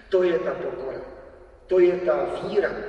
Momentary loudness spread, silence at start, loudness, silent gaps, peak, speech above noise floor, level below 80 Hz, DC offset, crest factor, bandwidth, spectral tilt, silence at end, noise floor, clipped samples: 14 LU; 0.1 s; -24 LUFS; none; -8 dBFS; 24 dB; -52 dBFS; under 0.1%; 16 dB; 6.8 kHz; -7 dB/octave; 0 s; -47 dBFS; under 0.1%